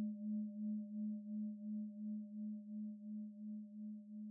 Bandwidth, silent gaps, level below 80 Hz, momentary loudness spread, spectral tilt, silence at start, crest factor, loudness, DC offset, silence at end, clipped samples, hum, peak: 0.7 kHz; none; under -90 dBFS; 7 LU; -9.5 dB/octave; 0 s; 10 dB; -47 LUFS; under 0.1%; 0 s; under 0.1%; none; -36 dBFS